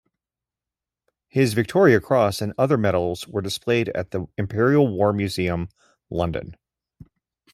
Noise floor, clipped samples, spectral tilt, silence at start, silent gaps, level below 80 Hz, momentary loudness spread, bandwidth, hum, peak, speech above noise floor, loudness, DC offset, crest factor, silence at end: -89 dBFS; under 0.1%; -6.5 dB/octave; 1.35 s; none; -52 dBFS; 12 LU; 14.5 kHz; none; -2 dBFS; 68 dB; -22 LUFS; under 0.1%; 20 dB; 1 s